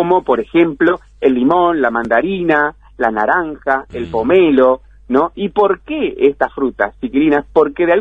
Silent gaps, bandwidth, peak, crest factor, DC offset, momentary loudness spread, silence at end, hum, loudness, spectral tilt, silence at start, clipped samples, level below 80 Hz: none; 5 kHz; 0 dBFS; 14 dB; under 0.1%; 6 LU; 0 s; none; -15 LUFS; -8 dB/octave; 0 s; under 0.1%; -42 dBFS